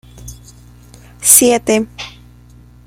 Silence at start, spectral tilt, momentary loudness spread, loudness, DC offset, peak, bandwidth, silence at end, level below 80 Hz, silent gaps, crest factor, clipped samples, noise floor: 0.25 s; -2 dB/octave; 23 LU; -10 LUFS; under 0.1%; 0 dBFS; 16.5 kHz; 0.8 s; -42 dBFS; none; 16 dB; 0.3%; -42 dBFS